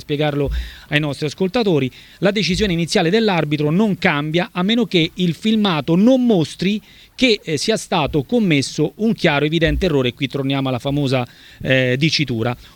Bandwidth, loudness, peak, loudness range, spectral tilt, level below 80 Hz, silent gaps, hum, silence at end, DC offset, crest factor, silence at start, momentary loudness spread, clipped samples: 18.5 kHz; -18 LUFS; 0 dBFS; 2 LU; -5.5 dB/octave; -36 dBFS; none; none; 0.1 s; under 0.1%; 18 dB; 0.1 s; 6 LU; under 0.1%